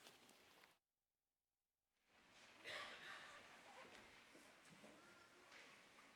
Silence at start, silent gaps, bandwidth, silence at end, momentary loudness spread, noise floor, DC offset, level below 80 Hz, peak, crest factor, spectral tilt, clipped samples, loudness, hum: 0 s; none; 16.5 kHz; 0 s; 14 LU; under -90 dBFS; under 0.1%; under -90 dBFS; -42 dBFS; 22 dB; -1.5 dB/octave; under 0.1%; -61 LUFS; none